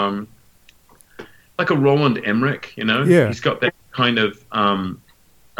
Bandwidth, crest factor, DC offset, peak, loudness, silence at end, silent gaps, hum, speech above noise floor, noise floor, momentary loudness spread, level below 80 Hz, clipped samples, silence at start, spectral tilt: 16.5 kHz; 18 dB; under 0.1%; -2 dBFS; -19 LUFS; 0.65 s; none; none; 34 dB; -52 dBFS; 15 LU; -58 dBFS; under 0.1%; 0 s; -6.5 dB/octave